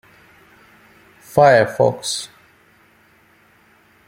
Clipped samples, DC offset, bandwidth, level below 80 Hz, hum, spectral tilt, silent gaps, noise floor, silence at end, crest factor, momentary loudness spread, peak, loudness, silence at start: under 0.1%; under 0.1%; 16 kHz; -60 dBFS; none; -4 dB/octave; none; -54 dBFS; 1.8 s; 20 dB; 14 LU; -2 dBFS; -16 LUFS; 1.35 s